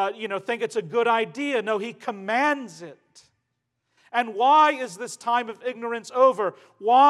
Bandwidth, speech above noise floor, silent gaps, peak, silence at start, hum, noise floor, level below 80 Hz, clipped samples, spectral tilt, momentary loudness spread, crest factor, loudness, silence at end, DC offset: 12.5 kHz; 55 dB; none; -6 dBFS; 0 s; none; -78 dBFS; -88 dBFS; under 0.1%; -3.5 dB/octave; 13 LU; 18 dB; -24 LUFS; 0 s; under 0.1%